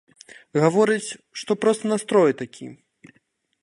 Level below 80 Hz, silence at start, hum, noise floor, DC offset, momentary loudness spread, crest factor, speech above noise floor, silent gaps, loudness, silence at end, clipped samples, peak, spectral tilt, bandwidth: -72 dBFS; 0.55 s; none; -67 dBFS; under 0.1%; 16 LU; 20 dB; 45 dB; none; -21 LUFS; 0.9 s; under 0.1%; -2 dBFS; -5.5 dB/octave; 11.5 kHz